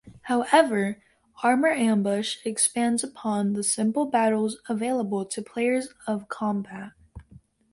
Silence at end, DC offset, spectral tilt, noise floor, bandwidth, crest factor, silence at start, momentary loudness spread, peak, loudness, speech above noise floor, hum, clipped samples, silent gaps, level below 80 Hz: 0.5 s; under 0.1%; -4 dB/octave; -54 dBFS; 11.5 kHz; 20 dB; 0.05 s; 10 LU; -6 dBFS; -25 LUFS; 29 dB; none; under 0.1%; none; -62 dBFS